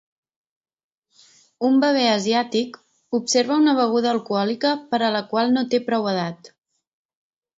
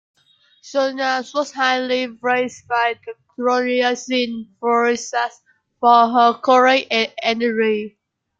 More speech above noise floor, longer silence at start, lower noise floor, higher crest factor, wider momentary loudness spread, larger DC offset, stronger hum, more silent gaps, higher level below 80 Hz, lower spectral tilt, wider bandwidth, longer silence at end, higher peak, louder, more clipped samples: about the same, 36 dB vs 38 dB; first, 1.6 s vs 0.65 s; about the same, -56 dBFS vs -56 dBFS; about the same, 18 dB vs 18 dB; second, 8 LU vs 11 LU; neither; neither; neither; about the same, -72 dBFS vs -68 dBFS; about the same, -4 dB/octave vs -3 dB/octave; about the same, 8 kHz vs 7.8 kHz; first, 1.1 s vs 0.5 s; about the same, -4 dBFS vs -2 dBFS; second, -21 LUFS vs -18 LUFS; neither